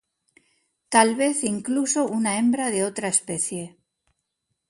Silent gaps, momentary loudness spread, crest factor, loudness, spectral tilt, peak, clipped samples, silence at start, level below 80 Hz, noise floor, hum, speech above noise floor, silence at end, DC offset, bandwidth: none; 8 LU; 22 dB; -22 LUFS; -3 dB/octave; -2 dBFS; under 0.1%; 0.9 s; -70 dBFS; -78 dBFS; none; 56 dB; 1 s; under 0.1%; 11.5 kHz